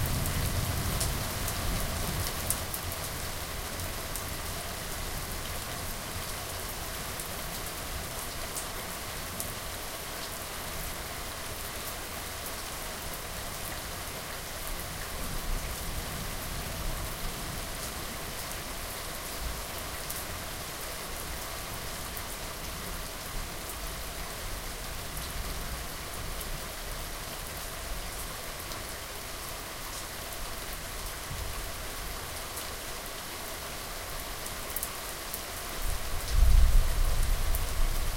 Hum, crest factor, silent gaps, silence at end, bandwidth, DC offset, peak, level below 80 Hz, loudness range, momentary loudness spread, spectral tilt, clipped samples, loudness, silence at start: none; 26 dB; none; 0 s; 17 kHz; under 0.1%; -6 dBFS; -36 dBFS; 5 LU; 6 LU; -3 dB/octave; under 0.1%; -35 LUFS; 0 s